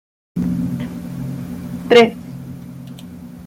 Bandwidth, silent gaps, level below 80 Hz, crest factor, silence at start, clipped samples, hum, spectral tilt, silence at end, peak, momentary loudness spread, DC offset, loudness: 16 kHz; none; -46 dBFS; 18 dB; 0.35 s; under 0.1%; none; -6 dB/octave; 0 s; -2 dBFS; 23 LU; under 0.1%; -18 LUFS